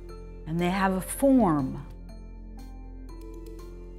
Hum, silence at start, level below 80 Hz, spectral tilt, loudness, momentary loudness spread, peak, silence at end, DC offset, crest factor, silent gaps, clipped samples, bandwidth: none; 0 s; -42 dBFS; -6 dB/octave; -25 LUFS; 23 LU; -10 dBFS; 0 s; under 0.1%; 18 dB; none; under 0.1%; 15.5 kHz